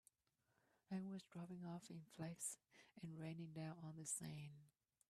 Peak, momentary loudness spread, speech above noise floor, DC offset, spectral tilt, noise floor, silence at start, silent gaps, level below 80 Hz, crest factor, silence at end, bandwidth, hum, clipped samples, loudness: -36 dBFS; 11 LU; 34 dB; under 0.1%; -5 dB/octave; -87 dBFS; 0.9 s; none; -88 dBFS; 20 dB; 0.4 s; 14 kHz; none; under 0.1%; -53 LUFS